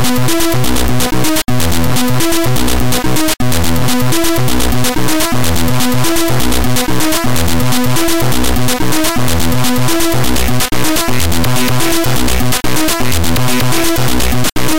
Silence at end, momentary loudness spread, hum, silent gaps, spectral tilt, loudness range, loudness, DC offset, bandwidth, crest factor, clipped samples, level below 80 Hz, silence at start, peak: 0 s; 1 LU; none; none; -4 dB/octave; 0 LU; -13 LUFS; 30%; 17.5 kHz; 10 dB; under 0.1%; -24 dBFS; 0 s; -2 dBFS